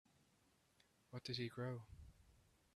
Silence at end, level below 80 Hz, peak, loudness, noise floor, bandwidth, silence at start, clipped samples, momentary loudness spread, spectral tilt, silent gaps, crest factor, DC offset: 0.35 s; -72 dBFS; -32 dBFS; -49 LUFS; -78 dBFS; 13.5 kHz; 1.1 s; under 0.1%; 18 LU; -6 dB/octave; none; 22 dB; under 0.1%